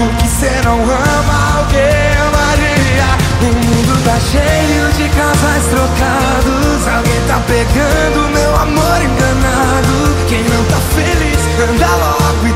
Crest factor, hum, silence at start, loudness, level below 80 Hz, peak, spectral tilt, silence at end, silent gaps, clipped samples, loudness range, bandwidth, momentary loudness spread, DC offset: 10 dB; none; 0 s; -11 LUFS; -18 dBFS; 0 dBFS; -5 dB/octave; 0 s; none; under 0.1%; 1 LU; 16.5 kHz; 2 LU; under 0.1%